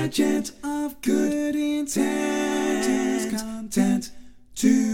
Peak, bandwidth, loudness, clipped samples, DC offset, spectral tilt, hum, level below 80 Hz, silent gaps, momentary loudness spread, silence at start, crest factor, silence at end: -6 dBFS; 17 kHz; -24 LUFS; under 0.1%; under 0.1%; -4.5 dB/octave; none; -54 dBFS; none; 6 LU; 0 s; 16 dB; 0 s